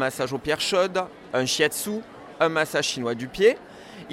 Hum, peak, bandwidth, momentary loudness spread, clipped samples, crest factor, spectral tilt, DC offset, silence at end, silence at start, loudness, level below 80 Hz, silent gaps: none; -6 dBFS; 16.5 kHz; 13 LU; under 0.1%; 18 dB; -3 dB/octave; under 0.1%; 0 s; 0 s; -24 LUFS; -58 dBFS; none